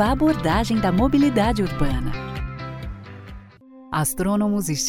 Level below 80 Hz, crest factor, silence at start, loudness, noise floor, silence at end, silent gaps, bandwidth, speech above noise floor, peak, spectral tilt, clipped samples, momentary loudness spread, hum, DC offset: -32 dBFS; 16 dB; 0 s; -21 LUFS; -45 dBFS; 0 s; none; 17 kHz; 25 dB; -6 dBFS; -5.5 dB/octave; under 0.1%; 18 LU; none; under 0.1%